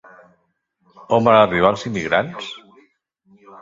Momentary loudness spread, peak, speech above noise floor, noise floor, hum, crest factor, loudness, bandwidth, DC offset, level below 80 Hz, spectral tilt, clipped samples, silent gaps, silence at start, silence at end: 19 LU; 0 dBFS; 51 dB; -68 dBFS; none; 20 dB; -17 LUFS; 7.8 kHz; under 0.1%; -52 dBFS; -6 dB/octave; under 0.1%; none; 1.1 s; 1.05 s